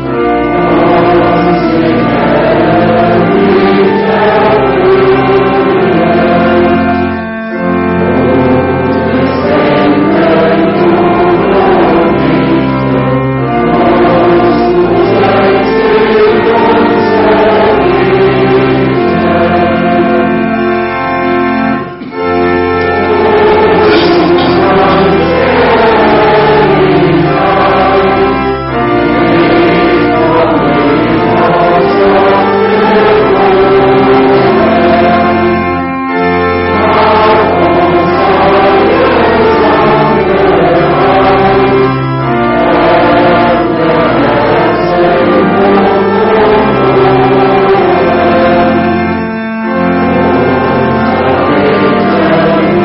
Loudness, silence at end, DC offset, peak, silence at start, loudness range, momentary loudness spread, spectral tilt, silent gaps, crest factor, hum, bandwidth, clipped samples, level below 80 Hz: -7 LUFS; 0 s; under 0.1%; 0 dBFS; 0 s; 2 LU; 4 LU; -5 dB/octave; none; 6 dB; none; 5.8 kHz; under 0.1%; -32 dBFS